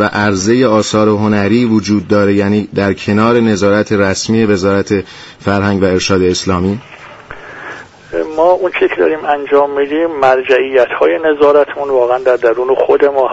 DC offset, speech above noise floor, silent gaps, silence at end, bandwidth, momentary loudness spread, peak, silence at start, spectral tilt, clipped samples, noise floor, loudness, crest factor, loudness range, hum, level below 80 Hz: under 0.1%; 20 dB; none; 0 s; 8 kHz; 9 LU; 0 dBFS; 0 s; -5.5 dB/octave; under 0.1%; -32 dBFS; -12 LUFS; 12 dB; 4 LU; none; -46 dBFS